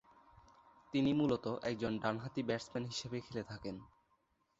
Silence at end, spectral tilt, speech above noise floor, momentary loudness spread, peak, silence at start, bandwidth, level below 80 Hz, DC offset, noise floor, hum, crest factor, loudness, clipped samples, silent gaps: 0.7 s; -5.5 dB/octave; 40 dB; 12 LU; -20 dBFS; 0.9 s; 8 kHz; -68 dBFS; under 0.1%; -78 dBFS; none; 20 dB; -39 LUFS; under 0.1%; none